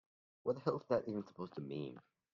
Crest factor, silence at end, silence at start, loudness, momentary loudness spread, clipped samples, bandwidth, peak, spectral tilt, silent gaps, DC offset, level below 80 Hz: 22 dB; 0.35 s; 0.45 s; -42 LUFS; 11 LU; under 0.1%; 7.2 kHz; -20 dBFS; -7 dB/octave; none; under 0.1%; -80 dBFS